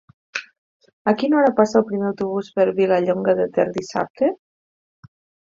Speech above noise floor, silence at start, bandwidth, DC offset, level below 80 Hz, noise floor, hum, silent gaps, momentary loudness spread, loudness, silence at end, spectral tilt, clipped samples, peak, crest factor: over 71 dB; 0.35 s; 7.6 kHz; under 0.1%; -64 dBFS; under -90 dBFS; none; 0.58-0.80 s, 0.93-1.05 s, 4.10-4.14 s; 14 LU; -20 LUFS; 1.1 s; -6.5 dB/octave; under 0.1%; -4 dBFS; 18 dB